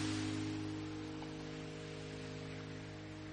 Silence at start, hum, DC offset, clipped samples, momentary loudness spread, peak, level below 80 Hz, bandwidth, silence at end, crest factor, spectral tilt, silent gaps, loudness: 0 s; none; under 0.1%; under 0.1%; 8 LU; -28 dBFS; -62 dBFS; 10 kHz; 0 s; 14 dB; -5.5 dB/octave; none; -45 LUFS